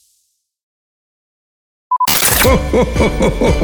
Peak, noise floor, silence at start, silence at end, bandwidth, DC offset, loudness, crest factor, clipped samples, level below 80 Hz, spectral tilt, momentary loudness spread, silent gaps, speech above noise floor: 0 dBFS; -64 dBFS; 1.9 s; 0 s; over 20 kHz; under 0.1%; -12 LUFS; 14 dB; under 0.1%; -24 dBFS; -4 dB/octave; 6 LU; none; 51 dB